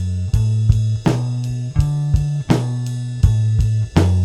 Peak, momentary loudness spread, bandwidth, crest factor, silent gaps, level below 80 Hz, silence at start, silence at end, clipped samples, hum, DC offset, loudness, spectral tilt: 0 dBFS; 6 LU; 11.5 kHz; 16 dB; none; -26 dBFS; 0 s; 0 s; under 0.1%; none; under 0.1%; -18 LUFS; -7.5 dB/octave